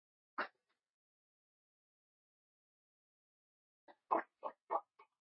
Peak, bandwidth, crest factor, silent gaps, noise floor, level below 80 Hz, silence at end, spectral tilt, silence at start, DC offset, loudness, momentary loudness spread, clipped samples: -20 dBFS; 5.4 kHz; 28 dB; 0.94-3.88 s, 4.62-4.67 s; -65 dBFS; under -90 dBFS; 0.25 s; -1 dB/octave; 0.4 s; under 0.1%; -43 LUFS; 11 LU; under 0.1%